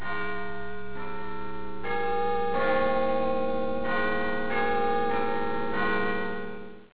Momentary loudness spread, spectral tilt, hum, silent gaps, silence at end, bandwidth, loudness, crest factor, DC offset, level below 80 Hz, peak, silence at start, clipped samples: 12 LU; -9 dB/octave; none; none; 0 s; 4 kHz; -29 LUFS; 14 dB; 4%; -52 dBFS; -14 dBFS; 0 s; under 0.1%